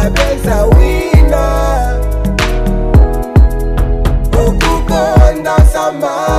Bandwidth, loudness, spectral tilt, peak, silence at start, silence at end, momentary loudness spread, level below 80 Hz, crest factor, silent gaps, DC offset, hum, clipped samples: 15 kHz; -12 LUFS; -6.5 dB/octave; 0 dBFS; 0 s; 0 s; 6 LU; -12 dBFS; 10 dB; none; under 0.1%; none; 3%